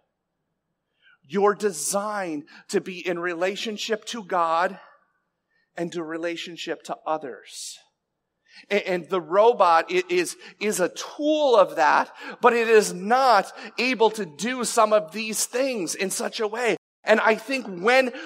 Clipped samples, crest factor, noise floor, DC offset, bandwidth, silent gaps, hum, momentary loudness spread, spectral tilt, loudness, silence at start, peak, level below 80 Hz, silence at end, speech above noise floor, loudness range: under 0.1%; 20 dB; -79 dBFS; under 0.1%; 16 kHz; 16.78-17.03 s; none; 13 LU; -3 dB/octave; -23 LUFS; 1.3 s; -4 dBFS; -86 dBFS; 0 s; 56 dB; 10 LU